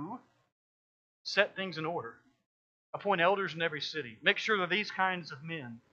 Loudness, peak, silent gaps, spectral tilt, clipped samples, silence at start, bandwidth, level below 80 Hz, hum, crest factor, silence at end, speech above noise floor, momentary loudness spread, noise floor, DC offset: -32 LUFS; -8 dBFS; 0.52-1.25 s, 2.46-2.93 s; -4.5 dB/octave; under 0.1%; 0 s; 7.8 kHz; -84 dBFS; none; 26 dB; 0.15 s; over 57 dB; 16 LU; under -90 dBFS; under 0.1%